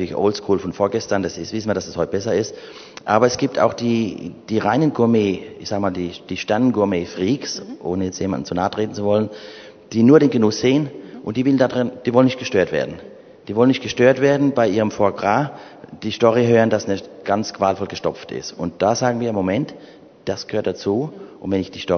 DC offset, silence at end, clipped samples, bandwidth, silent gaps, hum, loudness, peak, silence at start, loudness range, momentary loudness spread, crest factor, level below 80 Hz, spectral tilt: under 0.1%; 0 s; under 0.1%; 6.6 kHz; none; none; -19 LUFS; 0 dBFS; 0 s; 5 LU; 12 LU; 20 dB; -56 dBFS; -6 dB/octave